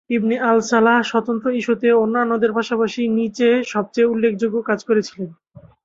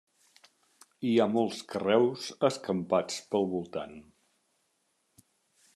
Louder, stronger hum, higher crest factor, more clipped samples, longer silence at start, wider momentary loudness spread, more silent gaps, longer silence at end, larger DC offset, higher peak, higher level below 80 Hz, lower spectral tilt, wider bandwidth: first, -18 LUFS vs -30 LUFS; neither; about the same, 16 dB vs 20 dB; neither; second, 0.1 s vs 1 s; second, 6 LU vs 10 LU; neither; second, 0.25 s vs 1.75 s; neither; first, -2 dBFS vs -12 dBFS; first, -62 dBFS vs -78 dBFS; about the same, -5.5 dB/octave vs -5.5 dB/octave; second, 7.8 kHz vs 12.5 kHz